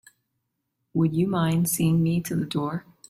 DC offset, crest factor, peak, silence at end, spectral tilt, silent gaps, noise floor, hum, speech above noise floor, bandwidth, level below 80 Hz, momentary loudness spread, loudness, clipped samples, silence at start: under 0.1%; 14 dB; -12 dBFS; 0.3 s; -6 dB/octave; none; -78 dBFS; none; 55 dB; 16 kHz; -58 dBFS; 7 LU; -24 LUFS; under 0.1%; 0.95 s